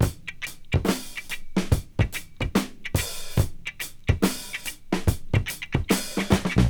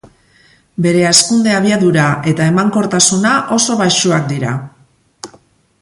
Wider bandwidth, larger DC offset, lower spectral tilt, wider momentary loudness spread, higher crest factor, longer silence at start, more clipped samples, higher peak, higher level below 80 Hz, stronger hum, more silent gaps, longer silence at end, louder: first, over 20 kHz vs 16 kHz; first, 0.1% vs under 0.1%; about the same, -5 dB/octave vs -4 dB/octave; second, 9 LU vs 18 LU; first, 22 dB vs 14 dB; second, 0 s vs 0.8 s; neither; second, -4 dBFS vs 0 dBFS; first, -34 dBFS vs -52 dBFS; neither; neither; second, 0 s vs 0.55 s; second, -27 LUFS vs -12 LUFS